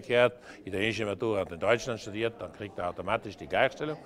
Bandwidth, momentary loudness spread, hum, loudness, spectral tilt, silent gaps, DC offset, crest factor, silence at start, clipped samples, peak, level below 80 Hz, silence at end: 13 kHz; 9 LU; none; -30 LUFS; -5 dB/octave; none; under 0.1%; 22 dB; 0 s; under 0.1%; -8 dBFS; -60 dBFS; 0 s